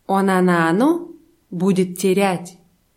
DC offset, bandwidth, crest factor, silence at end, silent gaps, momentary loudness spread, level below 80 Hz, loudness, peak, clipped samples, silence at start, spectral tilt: under 0.1%; 16.5 kHz; 14 dB; 0.45 s; none; 16 LU; -64 dBFS; -18 LUFS; -4 dBFS; under 0.1%; 0.1 s; -6 dB/octave